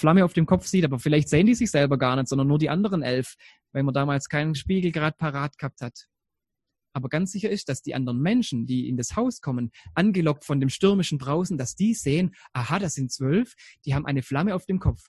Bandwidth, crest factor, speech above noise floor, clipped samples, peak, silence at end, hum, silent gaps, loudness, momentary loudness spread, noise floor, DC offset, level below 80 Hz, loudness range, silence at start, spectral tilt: 12.5 kHz; 20 dB; 62 dB; under 0.1%; -4 dBFS; 0.15 s; none; none; -25 LUFS; 9 LU; -86 dBFS; under 0.1%; -46 dBFS; 6 LU; 0 s; -6 dB/octave